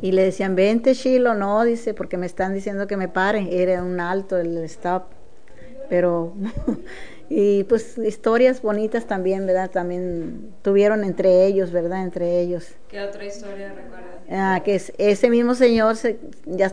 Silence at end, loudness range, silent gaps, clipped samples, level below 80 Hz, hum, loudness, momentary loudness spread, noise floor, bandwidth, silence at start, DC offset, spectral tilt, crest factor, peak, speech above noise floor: 0 s; 4 LU; none; under 0.1%; -48 dBFS; none; -21 LUFS; 15 LU; -46 dBFS; 10 kHz; 0 s; 2%; -6.5 dB/octave; 18 dB; -2 dBFS; 26 dB